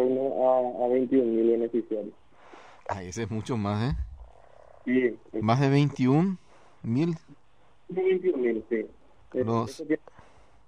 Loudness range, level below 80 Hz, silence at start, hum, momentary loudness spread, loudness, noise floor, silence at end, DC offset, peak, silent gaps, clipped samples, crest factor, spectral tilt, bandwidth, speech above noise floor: 5 LU; -50 dBFS; 0 s; none; 13 LU; -27 LUFS; -58 dBFS; 0.7 s; 0.2%; -10 dBFS; none; under 0.1%; 18 dB; -8 dB/octave; 10.5 kHz; 32 dB